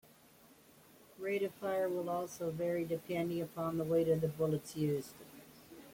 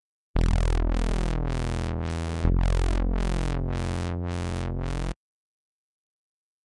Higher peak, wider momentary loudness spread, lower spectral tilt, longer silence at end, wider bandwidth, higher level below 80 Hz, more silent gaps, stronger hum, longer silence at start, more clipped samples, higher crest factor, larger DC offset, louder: second, -20 dBFS vs -14 dBFS; first, 19 LU vs 6 LU; about the same, -6.5 dB/octave vs -6.5 dB/octave; second, 0 s vs 1.55 s; first, 16.5 kHz vs 11 kHz; second, -70 dBFS vs -28 dBFS; neither; neither; first, 1.2 s vs 0.35 s; neither; about the same, 16 dB vs 14 dB; neither; second, -37 LUFS vs -29 LUFS